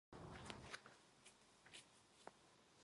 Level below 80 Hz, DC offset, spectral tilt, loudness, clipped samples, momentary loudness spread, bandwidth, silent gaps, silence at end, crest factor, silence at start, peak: -76 dBFS; under 0.1%; -3.5 dB/octave; -60 LUFS; under 0.1%; 12 LU; 11.5 kHz; none; 0 s; 32 dB; 0.1 s; -30 dBFS